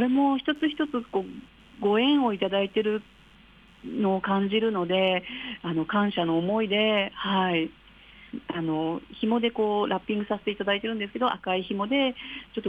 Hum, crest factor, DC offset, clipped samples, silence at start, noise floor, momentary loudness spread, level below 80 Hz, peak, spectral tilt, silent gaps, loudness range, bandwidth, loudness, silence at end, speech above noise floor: none; 14 dB; under 0.1%; under 0.1%; 0 s; -54 dBFS; 10 LU; -60 dBFS; -12 dBFS; -7.5 dB/octave; none; 2 LU; 5 kHz; -26 LUFS; 0 s; 28 dB